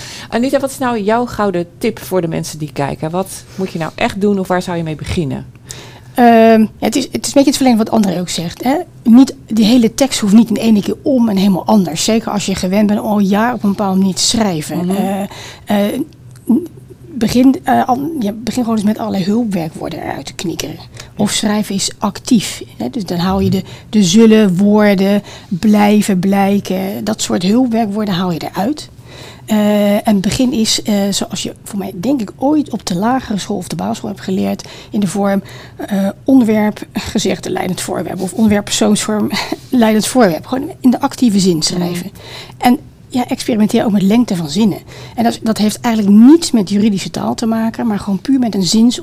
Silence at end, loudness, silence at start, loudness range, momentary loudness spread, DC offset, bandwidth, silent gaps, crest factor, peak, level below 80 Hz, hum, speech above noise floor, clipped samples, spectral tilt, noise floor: 0 s; -14 LUFS; 0 s; 6 LU; 12 LU; under 0.1%; 16 kHz; none; 14 dB; 0 dBFS; -42 dBFS; none; 21 dB; under 0.1%; -5 dB/octave; -34 dBFS